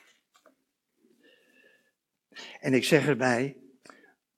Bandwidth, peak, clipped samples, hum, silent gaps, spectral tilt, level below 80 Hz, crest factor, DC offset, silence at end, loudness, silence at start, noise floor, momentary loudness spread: 15 kHz; -6 dBFS; under 0.1%; none; none; -5 dB/octave; -76 dBFS; 24 dB; under 0.1%; 0.85 s; -26 LUFS; 2.35 s; -77 dBFS; 22 LU